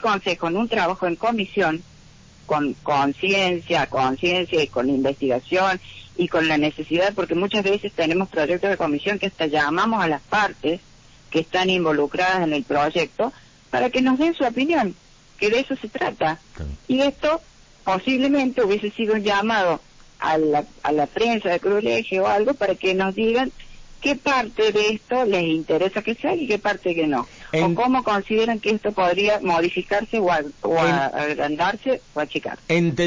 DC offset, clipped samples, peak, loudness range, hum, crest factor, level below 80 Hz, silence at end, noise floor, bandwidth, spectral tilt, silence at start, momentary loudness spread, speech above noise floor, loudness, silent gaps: under 0.1%; under 0.1%; -8 dBFS; 2 LU; none; 12 dB; -50 dBFS; 0 s; -48 dBFS; 7.6 kHz; -5.5 dB/octave; 0 s; 6 LU; 27 dB; -21 LUFS; none